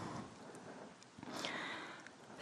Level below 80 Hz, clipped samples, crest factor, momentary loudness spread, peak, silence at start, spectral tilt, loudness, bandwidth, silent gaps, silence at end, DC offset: -78 dBFS; under 0.1%; 34 dB; 12 LU; -14 dBFS; 0 s; -3.5 dB/octave; -48 LUFS; 12 kHz; none; 0 s; under 0.1%